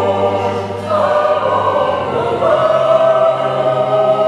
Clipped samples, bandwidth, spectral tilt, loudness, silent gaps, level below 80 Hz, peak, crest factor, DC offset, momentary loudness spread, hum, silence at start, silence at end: under 0.1%; 10.5 kHz; -6.5 dB/octave; -14 LUFS; none; -56 dBFS; 0 dBFS; 14 dB; under 0.1%; 6 LU; none; 0 s; 0 s